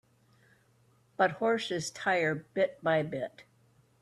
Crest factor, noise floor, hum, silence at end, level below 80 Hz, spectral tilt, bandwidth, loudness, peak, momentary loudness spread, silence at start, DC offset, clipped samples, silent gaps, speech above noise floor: 20 dB; -67 dBFS; none; 0.6 s; -74 dBFS; -4.5 dB/octave; 12.5 kHz; -31 LUFS; -14 dBFS; 9 LU; 1.2 s; under 0.1%; under 0.1%; none; 36 dB